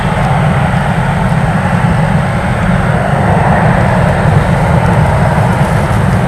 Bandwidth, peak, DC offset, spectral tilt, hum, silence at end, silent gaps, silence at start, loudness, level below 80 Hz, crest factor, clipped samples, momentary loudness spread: 12 kHz; 0 dBFS; under 0.1%; -7.5 dB/octave; none; 0 s; none; 0 s; -10 LUFS; -22 dBFS; 10 dB; 0.4%; 3 LU